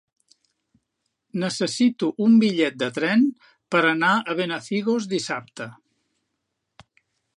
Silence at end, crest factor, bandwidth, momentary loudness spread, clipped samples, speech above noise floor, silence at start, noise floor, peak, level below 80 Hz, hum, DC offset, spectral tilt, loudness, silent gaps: 1.65 s; 20 dB; 11 kHz; 13 LU; under 0.1%; 57 dB; 1.35 s; -78 dBFS; -4 dBFS; -74 dBFS; none; under 0.1%; -5 dB/octave; -22 LUFS; none